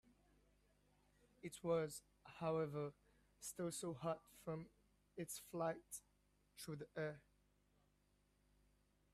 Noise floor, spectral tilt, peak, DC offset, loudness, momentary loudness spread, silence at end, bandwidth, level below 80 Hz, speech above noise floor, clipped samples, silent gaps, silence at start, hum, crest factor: -80 dBFS; -5 dB/octave; -30 dBFS; under 0.1%; -48 LUFS; 14 LU; 1.95 s; 15.5 kHz; -78 dBFS; 33 dB; under 0.1%; none; 1.45 s; 50 Hz at -75 dBFS; 20 dB